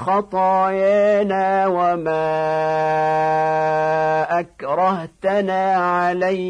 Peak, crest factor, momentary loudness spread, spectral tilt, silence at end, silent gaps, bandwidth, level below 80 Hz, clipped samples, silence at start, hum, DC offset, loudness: -6 dBFS; 12 dB; 4 LU; -7 dB/octave; 0 s; none; 10 kHz; -58 dBFS; under 0.1%; 0 s; none; under 0.1%; -18 LUFS